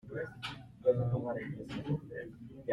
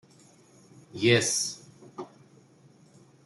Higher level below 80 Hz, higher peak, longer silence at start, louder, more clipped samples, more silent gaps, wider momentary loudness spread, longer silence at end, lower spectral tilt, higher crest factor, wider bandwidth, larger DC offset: first, -62 dBFS vs -74 dBFS; second, -16 dBFS vs -8 dBFS; second, 0.05 s vs 0.95 s; second, -37 LUFS vs -25 LUFS; neither; neither; second, 14 LU vs 24 LU; second, 0 s vs 1.2 s; first, -8 dB/octave vs -3 dB/octave; about the same, 20 dB vs 24 dB; about the same, 11.5 kHz vs 12.5 kHz; neither